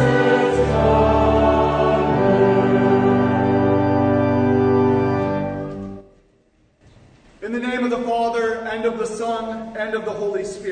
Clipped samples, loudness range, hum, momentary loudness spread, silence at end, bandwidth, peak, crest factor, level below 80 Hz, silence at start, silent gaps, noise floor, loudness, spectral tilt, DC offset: under 0.1%; 9 LU; none; 10 LU; 0 s; 9.6 kHz; -4 dBFS; 14 dB; -36 dBFS; 0 s; none; -59 dBFS; -18 LUFS; -7.5 dB/octave; under 0.1%